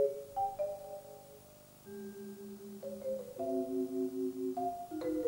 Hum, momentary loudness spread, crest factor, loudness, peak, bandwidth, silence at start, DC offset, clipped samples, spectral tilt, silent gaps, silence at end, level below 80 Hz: none; 17 LU; 18 dB; -40 LUFS; -22 dBFS; 16 kHz; 0 s; under 0.1%; under 0.1%; -6.5 dB/octave; none; 0 s; -70 dBFS